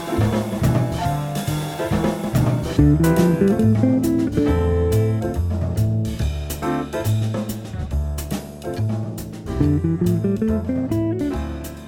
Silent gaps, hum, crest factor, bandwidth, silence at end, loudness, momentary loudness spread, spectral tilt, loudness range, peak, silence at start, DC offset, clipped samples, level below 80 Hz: none; none; 16 dB; 17.5 kHz; 0 s; -21 LUFS; 10 LU; -7.5 dB/octave; 6 LU; -4 dBFS; 0 s; under 0.1%; under 0.1%; -30 dBFS